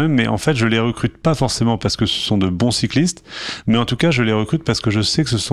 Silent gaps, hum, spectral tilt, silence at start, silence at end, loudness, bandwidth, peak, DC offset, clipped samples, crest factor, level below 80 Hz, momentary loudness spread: none; none; -5 dB/octave; 0 s; 0 s; -18 LUFS; 13.5 kHz; -4 dBFS; under 0.1%; under 0.1%; 14 dB; -42 dBFS; 4 LU